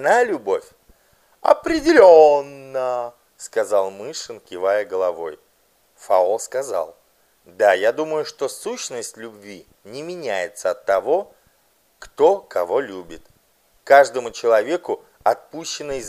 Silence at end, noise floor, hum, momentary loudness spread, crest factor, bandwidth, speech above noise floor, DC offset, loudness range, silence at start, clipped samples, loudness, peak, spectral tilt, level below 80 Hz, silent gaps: 0 s; -61 dBFS; none; 19 LU; 20 dB; 15 kHz; 42 dB; under 0.1%; 9 LU; 0 s; under 0.1%; -19 LUFS; 0 dBFS; -3 dB/octave; -56 dBFS; none